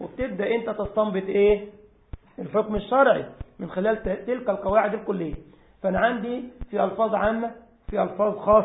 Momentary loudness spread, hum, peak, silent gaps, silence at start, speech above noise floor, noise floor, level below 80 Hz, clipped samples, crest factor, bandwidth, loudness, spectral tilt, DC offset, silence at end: 13 LU; none; -6 dBFS; none; 0 s; 20 dB; -43 dBFS; -46 dBFS; under 0.1%; 18 dB; 4 kHz; -25 LUFS; -11 dB/octave; under 0.1%; 0 s